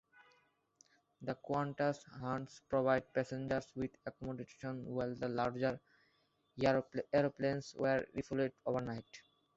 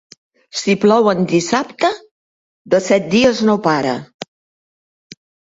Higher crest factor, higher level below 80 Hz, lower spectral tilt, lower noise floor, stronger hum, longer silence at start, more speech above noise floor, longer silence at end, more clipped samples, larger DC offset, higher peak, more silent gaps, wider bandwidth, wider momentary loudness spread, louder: about the same, 20 dB vs 16 dB; second, -68 dBFS vs -56 dBFS; about the same, -5.5 dB/octave vs -5 dB/octave; second, -77 dBFS vs under -90 dBFS; neither; first, 1.2 s vs 0.55 s; second, 39 dB vs over 75 dB; second, 0.35 s vs 1.25 s; neither; neither; second, -18 dBFS vs 0 dBFS; second, none vs 2.11-2.65 s, 4.14-4.19 s; about the same, 8 kHz vs 8 kHz; second, 12 LU vs 16 LU; second, -39 LUFS vs -15 LUFS